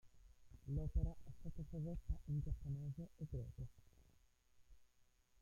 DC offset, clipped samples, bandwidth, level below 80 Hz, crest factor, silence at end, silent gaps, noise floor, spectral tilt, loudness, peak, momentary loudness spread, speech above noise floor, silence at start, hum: under 0.1%; under 0.1%; 7.2 kHz; -52 dBFS; 18 dB; 0.55 s; none; -74 dBFS; -9.5 dB/octave; -48 LUFS; -28 dBFS; 12 LU; 29 dB; 0.05 s; none